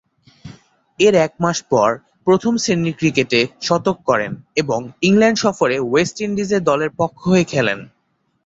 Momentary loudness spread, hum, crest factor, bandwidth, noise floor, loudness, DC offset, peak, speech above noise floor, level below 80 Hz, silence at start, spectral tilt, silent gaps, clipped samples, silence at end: 7 LU; none; 16 dB; 8 kHz; -66 dBFS; -17 LUFS; under 0.1%; -2 dBFS; 50 dB; -54 dBFS; 0.45 s; -5 dB/octave; none; under 0.1%; 0.6 s